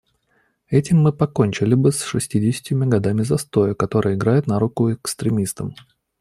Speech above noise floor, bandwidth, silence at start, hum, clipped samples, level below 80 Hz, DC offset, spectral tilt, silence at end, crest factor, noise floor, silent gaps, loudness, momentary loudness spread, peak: 46 dB; 13.5 kHz; 0.7 s; none; under 0.1%; -52 dBFS; under 0.1%; -6.5 dB/octave; 0.5 s; 16 dB; -64 dBFS; none; -19 LUFS; 6 LU; -2 dBFS